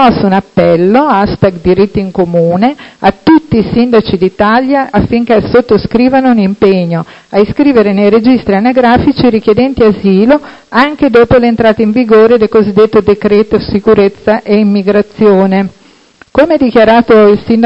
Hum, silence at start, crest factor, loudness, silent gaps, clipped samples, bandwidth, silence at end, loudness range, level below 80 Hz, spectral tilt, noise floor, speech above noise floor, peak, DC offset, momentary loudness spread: none; 0 s; 8 dB; -8 LUFS; none; 1%; 7.8 kHz; 0 s; 2 LU; -32 dBFS; -8.5 dB/octave; -41 dBFS; 34 dB; 0 dBFS; under 0.1%; 6 LU